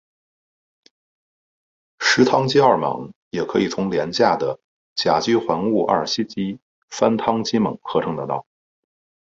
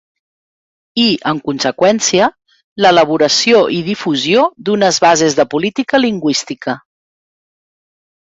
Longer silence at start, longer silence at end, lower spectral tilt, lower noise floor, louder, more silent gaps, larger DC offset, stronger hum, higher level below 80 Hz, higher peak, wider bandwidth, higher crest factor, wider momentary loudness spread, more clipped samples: first, 2 s vs 0.95 s; second, 0.85 s vs 1.5 s; first, -5 dB/octave vs -3.5 dB/octave; about the same, under -90 dBFS vs under -90 dBFS; second, -20 LUFS vs -13 LUFS; first, 3.16-3.31 s, 4.64-4.96 s, 6.62-6.88 s vs 2.64-2.76 s; neither; neither; about the same, -58 dBFS vs -56 dBFS; about the same, 0 dBFS vs 0 dBFS; about the same, 8 kHz vs 8 kHz; first, 20 dB vs 14 dB; first, 13 LU vs 8 LU; neither